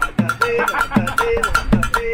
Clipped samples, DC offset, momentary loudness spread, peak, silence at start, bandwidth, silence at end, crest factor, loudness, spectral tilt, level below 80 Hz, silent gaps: under 0.1%; under 0.1%; 1 LU; -4 dBFS; 0 s; 17 kHz; 0 s; 14 dB; -18 LUFS; -5 dB/octave; -28 dBFS; none